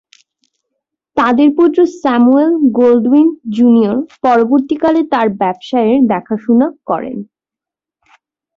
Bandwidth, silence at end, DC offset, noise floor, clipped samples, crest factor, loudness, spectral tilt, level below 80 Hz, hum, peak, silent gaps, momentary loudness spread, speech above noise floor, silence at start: 7.2 kHz; 1.3 s; under 0.1%; -86 dBFS; under 0.1%; 12 dB; -12 LUFS; -7.5 dB/octave; -56 dBFS; none; -2 dBFS; none; 8 LU; 75 dB; 1.15 s